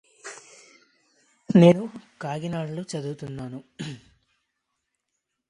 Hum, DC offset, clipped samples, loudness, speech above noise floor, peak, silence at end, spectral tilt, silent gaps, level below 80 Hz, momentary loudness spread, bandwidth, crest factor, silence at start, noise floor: none; under 0.1%; under 0.1%; -23 LUFS; 58 dB; -4 dBFS; 1.5 s; -7.5 dB/octave; none; -64 dBFS; 25 LU; 10.5 kHz; 24 dB; 0.25 s; -80 dBFS